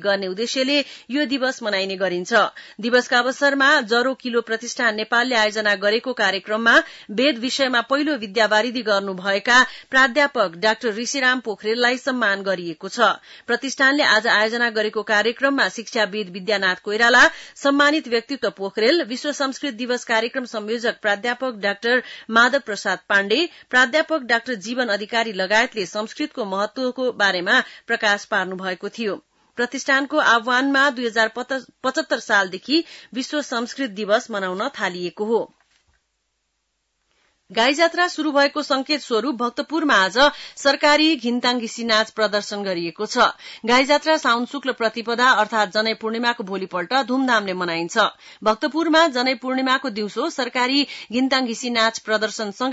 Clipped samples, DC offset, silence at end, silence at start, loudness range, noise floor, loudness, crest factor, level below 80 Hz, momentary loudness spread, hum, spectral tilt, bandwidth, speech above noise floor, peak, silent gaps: under 0.1%; under 0.1%; 0 s; 0 s; 4 LU; -73 dBFS; -20 LUFS; 16 dB; -62 dBFS; 9 LU; none; -2.5 dB/octave; 8 kHz; 53 dB; -4 dBFS; none